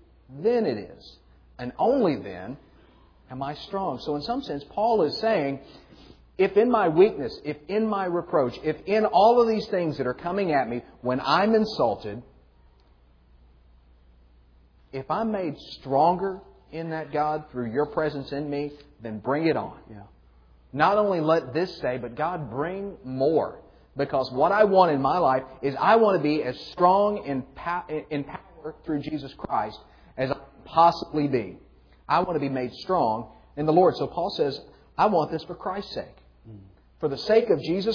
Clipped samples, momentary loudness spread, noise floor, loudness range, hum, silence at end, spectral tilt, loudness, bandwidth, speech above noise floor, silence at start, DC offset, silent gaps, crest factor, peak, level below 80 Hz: under 0.1%; 16 LU; -57 dBFS; 7 LU; none; 0 s; -7.5 dB/octave; -25 LUFS; 5.4 kHz; 33 dB; 0.3 s; under 0.1%; none; 20 dB; -6 dBFS; -56 dBFS